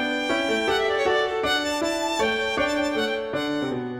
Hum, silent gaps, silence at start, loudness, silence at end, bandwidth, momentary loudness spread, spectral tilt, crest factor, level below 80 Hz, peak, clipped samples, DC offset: none; none; 0 s; -23 LUFS; 0 s; 16 kHz; 4 LU; -3 dB/octave; 14 dB; -52 dBFS; -10 dBFS; under 0.1%; under 0.1%